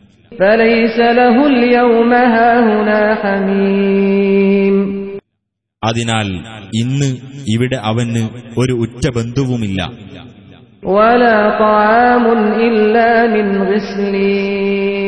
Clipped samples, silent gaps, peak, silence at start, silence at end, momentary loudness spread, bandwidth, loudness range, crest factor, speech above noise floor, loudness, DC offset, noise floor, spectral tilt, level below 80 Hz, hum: under 0.1%; none; 0 dBFS; 0.3 s; 0 s; 10 LU; 11 kHz; 7 LU; 12 dB; 61 dB; -12 LUFS; 0.4%; -73 dBFS; -6.5 dB/octave; -44 dBFS; none